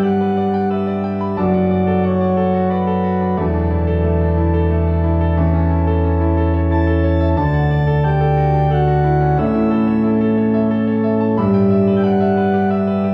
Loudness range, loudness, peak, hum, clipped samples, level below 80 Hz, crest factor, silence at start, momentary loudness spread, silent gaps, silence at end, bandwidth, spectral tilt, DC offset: 2 LU; -16 LUFS; -4 dBFS; none; under 0.1%; -26 dBFS; 12 dB; 0 s; 3 LU; none; 0 s; 5.4 kHz; -11 dB/octave; under 0.1%